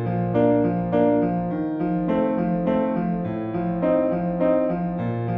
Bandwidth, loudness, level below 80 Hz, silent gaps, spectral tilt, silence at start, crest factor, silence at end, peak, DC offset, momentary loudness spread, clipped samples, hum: 4 kHz; -22 LUFS; -48 dBFS; none; -11.5 dB/octave; 0 s; 14 dB; 0 s; -8 dBFS; under 0.1%; 6 LU; under 0.1%; none